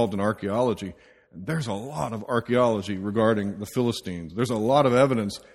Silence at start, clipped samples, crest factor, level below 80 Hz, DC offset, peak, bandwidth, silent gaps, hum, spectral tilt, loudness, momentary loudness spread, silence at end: 0 s; under 0.1%; 20 dB; -58 dBFS; under 0.1%; -6 dBFS; 15.5 kHz; none; none; -6.5 dB/octave; -25 LUFS; 11 LU; 0.15 s